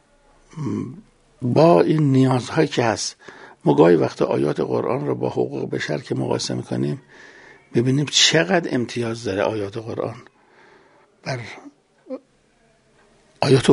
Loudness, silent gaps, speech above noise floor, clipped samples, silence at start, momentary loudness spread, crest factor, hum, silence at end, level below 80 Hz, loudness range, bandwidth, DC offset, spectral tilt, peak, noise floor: -20 LUFS; none; 40 dB; under 0.1%; 0.55 s; 18 LU; 20 dB; none; 0 s; -58 dBFS; 13 LU; 11 kHz; under 0.1%; -5 dB/octave; 0 dBFS; -59 dBFS